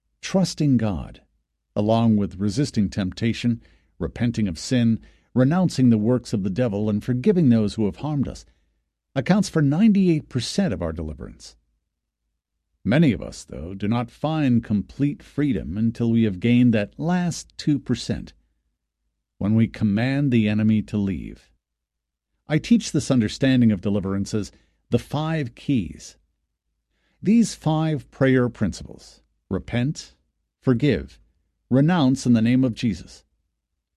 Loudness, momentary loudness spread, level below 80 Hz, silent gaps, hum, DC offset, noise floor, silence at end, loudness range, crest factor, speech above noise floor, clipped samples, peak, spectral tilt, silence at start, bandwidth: -22 LUFS; 12 LU; -46 dBFS; none; none; under 0.1%; -83 dBFS; 0.8 s; 4 LU; 18 dB; 62 dB; under 0.1%; -4 dBFS; -7 dB/octave; 0.25 s; 11.5 kHz